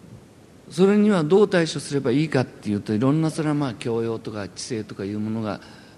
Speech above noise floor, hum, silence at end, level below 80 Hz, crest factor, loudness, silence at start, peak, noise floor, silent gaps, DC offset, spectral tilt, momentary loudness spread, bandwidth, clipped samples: 26 dB; none; 0.15 s; -60 dBFS; 18 dB; -23 LUFS; 0.05 s; -6 dBFS; -48 dBFS; none; under 0.1%; -6.5 dB/octave; 13 LU; 12 kHz; under 0.1%